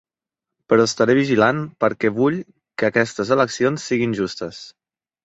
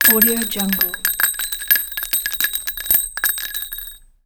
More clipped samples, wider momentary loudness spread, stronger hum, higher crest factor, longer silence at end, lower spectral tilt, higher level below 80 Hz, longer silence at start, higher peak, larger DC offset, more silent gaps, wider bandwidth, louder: neither; first, 13 LU vs 10 LU; neither; about the same, 18 dB vs 18 dB; first, 0.55 s vs 0.3 s; first, -5.5 dB/octave vs -1.5 dB/octave; second, -58 dBFS vs -44 dBFS; first, 0.7 s vs 0 s; about the same, -2 dBFS vs -2 dBFS; neither; neither; second, 8.2 kHz vs over 20 kHz; about the same, -19 LUFS vs -17 LUFS